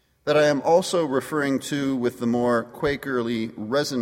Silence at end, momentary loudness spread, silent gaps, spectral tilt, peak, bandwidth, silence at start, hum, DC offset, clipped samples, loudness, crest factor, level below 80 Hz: 0 s; 7 LU; none; -5 dB/octave; -8 dBFS; 16.5 kHz; 0.25 s; none; under 0.1%; under 0.1%; -23 LUFS; 16 dB; -56 dBFS